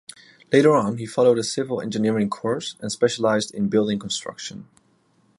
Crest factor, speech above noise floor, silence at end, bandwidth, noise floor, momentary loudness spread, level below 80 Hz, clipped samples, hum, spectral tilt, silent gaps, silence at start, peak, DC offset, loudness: 18 dB; 41 dB; 0.75 s; 11.5 kHz; -62 dBFS; 11 LU; -62 dBFS; under 0.1%; none; -5 dB/octave; none; 0.5 s; -4 dBFS; under 0.1%; -22 LUFS